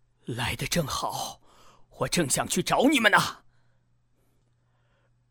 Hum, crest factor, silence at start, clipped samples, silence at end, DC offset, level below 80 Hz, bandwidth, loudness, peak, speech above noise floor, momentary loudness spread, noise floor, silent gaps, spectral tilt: none; 24 dB; 0.3 s; under 0.1%; 1.95 s; under 0.1%; -52 dBFS; 19.5 kHz; -25 LUFS; -4 dBFS; 42 dB; 14 LU; -67 dBFS; none; -3.5 dB/octave